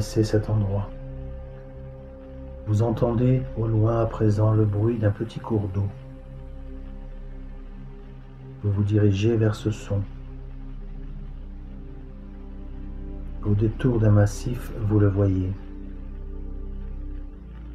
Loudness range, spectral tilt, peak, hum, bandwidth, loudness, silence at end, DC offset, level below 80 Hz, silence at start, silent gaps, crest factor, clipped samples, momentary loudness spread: 11 LU; -8.5 dB/octave; -8 dBFS; none; 9.4 kHz; -24 LUFS; 0 s; under 0.1%; -36 dBFS; 0 s; none; 18 dB; under 0.1%; 21 LU